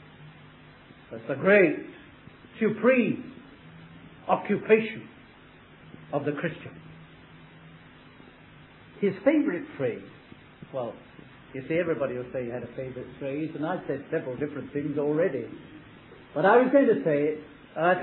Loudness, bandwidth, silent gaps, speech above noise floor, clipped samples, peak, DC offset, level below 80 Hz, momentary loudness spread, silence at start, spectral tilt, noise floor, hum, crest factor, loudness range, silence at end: -27 LUFS; 4.2 kHz; none; 26 dB; under 0.1%; -8 dBFS; under 0.1%; -64 dBFS; 26 LU; 0.2 s; -10.5 dB/octave; -52 dBFS; none; 22 dB; 8 LU; 0 s